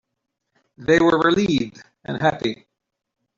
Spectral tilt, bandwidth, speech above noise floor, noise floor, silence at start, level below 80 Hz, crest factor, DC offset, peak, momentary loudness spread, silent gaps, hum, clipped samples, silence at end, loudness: -5.5 dB/octave; 7.4 kHz; 60 dB; -79 dBFS; 0.8 s; -52 dBFS; 18 dB; under 0.1%; -4 dBFS; 15 LU; none; none; under 0.1%; 0.85 s; -19 LUFS